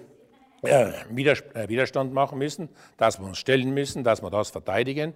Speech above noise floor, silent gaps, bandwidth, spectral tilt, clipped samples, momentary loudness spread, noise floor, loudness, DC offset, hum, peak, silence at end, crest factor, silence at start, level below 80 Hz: 32 dB; none; 16 kHz; -5 dB/octave; under 0.1%; 9 LU; -56 dBFS; -25 LUFS; under 0.1%; none; -6 dBFS; 0.05 s; 20 dB; 0 s; -60 dBFS